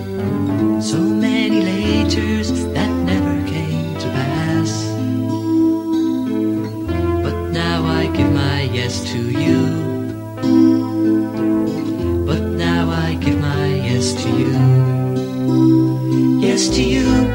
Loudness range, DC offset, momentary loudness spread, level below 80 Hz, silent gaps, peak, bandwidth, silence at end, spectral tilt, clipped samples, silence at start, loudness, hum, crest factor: 3 LU; under 0.1%; 7 LU; -36 dBFS; none; -2 dBFS; 16.5 kHz; 0 s; -6 dB/octave; under 0.1%; 0 s; -17 LUFS; none; 14 dB